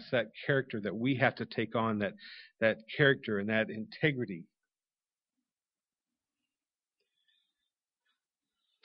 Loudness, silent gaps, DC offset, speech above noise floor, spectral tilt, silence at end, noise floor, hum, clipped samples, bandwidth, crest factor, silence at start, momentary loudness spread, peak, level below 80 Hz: -32 LUFS; none; under 0.1%; over 58 dB; -4 dB/octave; 4.4 s; under -90 dBFS; none; under 0.1%; 5.6 kHz; 24 dB; 0 s; 11 LU; -12 dBFS; -74 dBFS